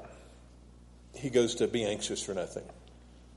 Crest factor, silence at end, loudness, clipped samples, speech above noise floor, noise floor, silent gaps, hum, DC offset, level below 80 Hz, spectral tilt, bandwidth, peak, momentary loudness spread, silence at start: 20 dB; 0 s; -32 LUFS; under 0.1%; 23 dB; -54 dBFS; none; 60 Hz at -50 dBFS; under 0.1%; -56 dBFS; -4 dB/octave; 11.5 kHz; -14 dBFS; 23 LU; 0 s